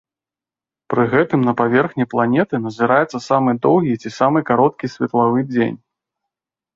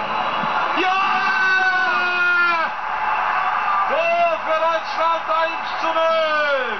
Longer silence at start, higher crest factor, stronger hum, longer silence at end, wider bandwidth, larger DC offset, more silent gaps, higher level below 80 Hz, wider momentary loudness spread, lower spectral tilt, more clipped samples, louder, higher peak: first, 0.9 s vs 0 s; first, 16 dB vs 10 dB; neither; first, 1 s vs 0 s; first, 7.6 kHz vs 6.4 kHz; second, under 0.1% vs 1%; neither; about the same, -58 dBFS vs -60 dBFS; about the same, 6 LU vs 5 LU; first, -7.5 dB/octave vs -3 dB/octave; neither; about the same, -17 LUFS vs -18 LUFS; first, -2 dBFS vs -8 dBFS